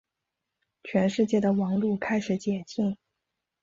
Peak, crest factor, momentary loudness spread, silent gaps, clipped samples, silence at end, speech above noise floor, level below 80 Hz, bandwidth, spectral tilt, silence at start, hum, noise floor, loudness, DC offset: -12 dBFS; 16 dB; 7 LU; none; under 0.1%; 0.7 s; 59 dB; -66 dBFS; 7.6 kHz; -7 dB/octave; 0.85 s; none; -85 dBFS; -27 LUFS; under 0.1%